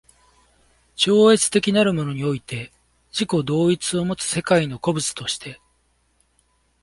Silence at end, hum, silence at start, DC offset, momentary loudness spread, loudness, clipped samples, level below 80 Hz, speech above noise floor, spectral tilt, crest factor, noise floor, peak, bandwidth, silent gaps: 1.3 s; none; 1 s; under 0.1%; 15 LU; -20 LUFS; under 0.1%; -56 dBFS; 45 dB; -4.5 dB/octave; 18 dB; -65 dBFS; -4 dBFS; 11.5 kHz; none